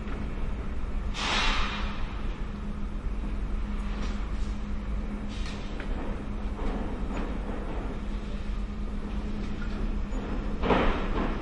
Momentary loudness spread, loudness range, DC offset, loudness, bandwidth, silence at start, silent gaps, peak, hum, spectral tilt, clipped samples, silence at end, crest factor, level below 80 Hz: 10 LU; 3 LU; under 0.1%; -33 LUFS; 9.6 kHz; 0 s; none; -10 dBFS; none; -5.5 dB/octave; under 0.1%; 0 s; 20 dB; -32 dBFS